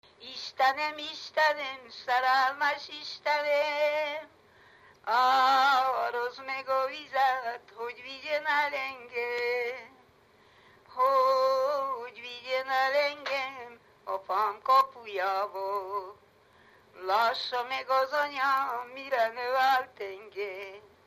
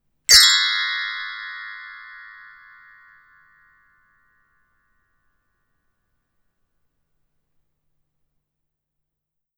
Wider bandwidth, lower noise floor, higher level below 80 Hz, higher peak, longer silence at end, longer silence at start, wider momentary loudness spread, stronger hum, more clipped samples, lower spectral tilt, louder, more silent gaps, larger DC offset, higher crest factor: second, 15 kHz vs over 20 kHz; second, -61 dBFS vs -82 dBFS; second, -78 dBFS vs -58 dBFS; second, -12 dBFS vs 0 dBFS; second, 0.25 s vs 7.35 s; about the same, 0.2 s vs 0.3 s; second, 15 LU vs 28 LU; neither; neither; first, -1.5 dB/octave vs 4 dB/octave; second, -29 LUFS vs -14 LUFS; neither; neither; second, 16 dB vs 26 dB